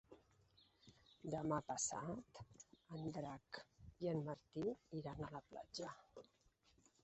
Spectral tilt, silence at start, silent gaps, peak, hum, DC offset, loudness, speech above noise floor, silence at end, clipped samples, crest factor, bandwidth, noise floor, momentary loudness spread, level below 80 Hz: -6 dB/octave; 0.1 s; none; -28 dBFS; none; under 0.1%; -48 LUFS; 29 dB; 0.8 s; under 0.1%; 22 dB; 8 kHz; -77 dBFS; 22 LU; -74 dBFS